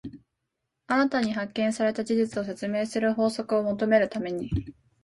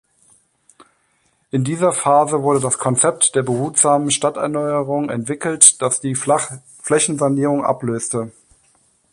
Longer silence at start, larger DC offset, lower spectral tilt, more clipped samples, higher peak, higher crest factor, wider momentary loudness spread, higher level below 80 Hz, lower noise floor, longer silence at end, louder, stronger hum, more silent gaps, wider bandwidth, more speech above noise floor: second, 0.05 s vs 1.55 s; neither; first, -6 dB/octave vs -3.5 dB/octave; neither; second, -8 dBFS vs 0 dBFS; about the same, 18 dB vs 18 dB; second, 8 LU vs 11 LU; first, -50 dBFS vs -60 dBFS; first, -82 dBFS vs -63 dBFS; second, 0.3 s vs 0.8 s; second, -26 LUFS vs -16 LUFS; neither; neither; second, 11.5 kHz vs 16 kHz; first, 56 dB vs 45 dB